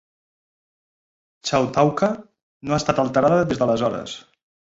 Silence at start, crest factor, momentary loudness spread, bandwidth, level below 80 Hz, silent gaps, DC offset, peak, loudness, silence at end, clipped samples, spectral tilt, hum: 1.45 s; 20 dB; 15 LU; 8 kHz; -52 dBFS; 2.43-2.61 s; under 0.1%; -2 dBFS; -21 LUFS; 0.5 s; under 0.1%; -5.5 dB/octave; none